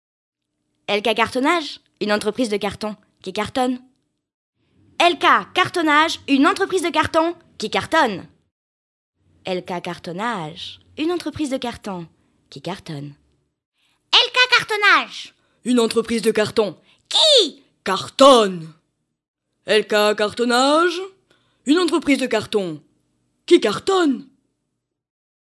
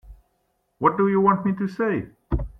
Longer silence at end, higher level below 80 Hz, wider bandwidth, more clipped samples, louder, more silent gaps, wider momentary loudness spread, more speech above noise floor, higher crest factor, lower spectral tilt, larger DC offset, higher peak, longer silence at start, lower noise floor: first, 1.25 s vs 0.1 s; second, -60 dBFS vs -38 dBFS; first, 12 kHz vs 6 kHz; neither; first, -18 LUFS vs -22 LUFS; first, 4.34-4.53 s, 8.51-9.13 s, 13.65-13.72 s, 19.28-19.34 s vs none; first, 18 LU vs 11 LU; first, 58 dB vs 50 dB; about the same, 20 dB vs 20 dB; second, -3 dB/octave vs -10 dB/octave; neither; first, 0 dBFS vs -4 dBFS; first, 0.9 s vs 0.05 s; first, -77 dBFS vs -71 dBFS